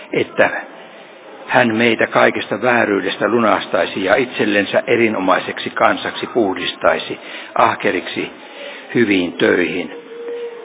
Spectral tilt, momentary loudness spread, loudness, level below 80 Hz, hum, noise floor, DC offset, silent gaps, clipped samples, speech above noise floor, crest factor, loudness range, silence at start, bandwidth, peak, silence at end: -8.5 dB/octave; 14 LU; -16 LUFS; -56 dBFS; none; -38 dBFS; under 0.1%; none; under 0.1%; 22 dB; 18 dB; 3 LU; 0 s; 4 kHz; 0 dBFS; 0 s